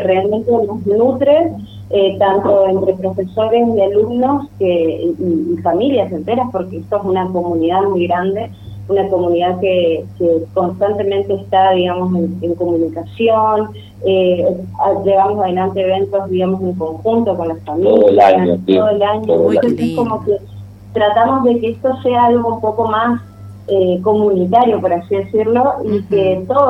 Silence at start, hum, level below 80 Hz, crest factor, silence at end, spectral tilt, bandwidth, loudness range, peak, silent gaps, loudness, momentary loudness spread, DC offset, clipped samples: 0 s; none; -48 dBFS; 14 dB; 0 s; -8.5 dB/octave; 8.4 kHz; 4 LU; 0 dBFS; none; -14 LUFS; 7 LU; under 0.1%; under 0.1%